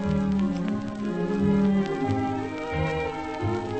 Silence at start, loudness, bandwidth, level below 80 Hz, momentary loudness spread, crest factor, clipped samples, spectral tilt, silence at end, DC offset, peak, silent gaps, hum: 0 s; -26 LUFS; 8.6 kHz; -44 dBFS; 8 LU; 16 dB; under 0.1%; -8 dB/octave; 0 s; under 0.1%; -10 dBFS; none; none